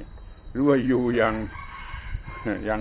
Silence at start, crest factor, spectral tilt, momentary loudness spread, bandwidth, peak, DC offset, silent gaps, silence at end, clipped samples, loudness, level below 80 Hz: 0 s; 16 dB; -11 dB/octave; 16 LU; 4 kHz; -8 dBFS; under 0.1%; none; 0 s; under 0.1%; -24 LUFS; -40 dBFS